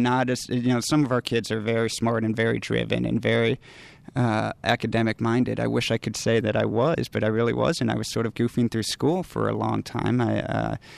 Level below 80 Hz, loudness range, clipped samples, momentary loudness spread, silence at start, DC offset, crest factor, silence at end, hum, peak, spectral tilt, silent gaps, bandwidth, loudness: -52 dBFS; 1 LU; under 0.1%; 4 LU; 0 s; under 0.1%; 18 dB; 0 s; none; -6 dBFS; -5.5 dB/octave; none; 13.5 kHz; -24 LUFS